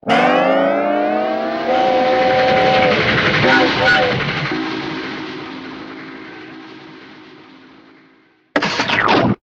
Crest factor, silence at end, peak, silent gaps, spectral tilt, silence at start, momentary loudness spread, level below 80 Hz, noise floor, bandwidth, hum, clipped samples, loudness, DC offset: 16 dB; 0.1 s; 0 dBFS; none; -5 dB/octave; 0.05 s; 20 LU; -48 dBFS; -53 dBFS; 8.2 kHz; none; under 0.1%; -15 LUFS; under 0.1%